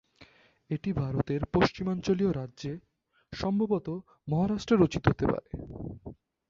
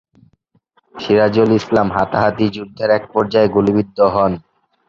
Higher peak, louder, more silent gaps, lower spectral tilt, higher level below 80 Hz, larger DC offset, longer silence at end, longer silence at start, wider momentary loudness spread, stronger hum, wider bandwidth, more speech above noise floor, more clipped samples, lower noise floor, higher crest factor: second, -6 dBFS vs -2 dBFS; second, -30 LUFS vs -15 LUFS; neither; about the same, -7.5 dB/octave vs -7.5 dB/octave; about the same, -50 dBFS vs -46 dBFS; neither; second, 0.35 s vs 0.5 s; second, 0.2 s vs 0.95 s; first, 16 LU vs 7 LU; neither; about the same, 7.6 kHz vs 7.4 kHz; second, 30 dB vs 45 dB; neither; about the same, -59 dBFS vs -60 dBFS; first, 24 dB vs 14 dB